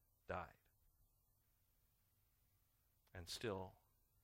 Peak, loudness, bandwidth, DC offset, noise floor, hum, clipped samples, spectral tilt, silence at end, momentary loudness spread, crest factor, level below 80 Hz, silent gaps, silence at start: -32 dBFS; -51 LUFS; 16 kHz; under 0.1%; -81 dBFS; none; under 0.1%; -4 dB/octave; 0.45 s; 12 LU; 26 dB; -74 dBFS; none; 0.3 s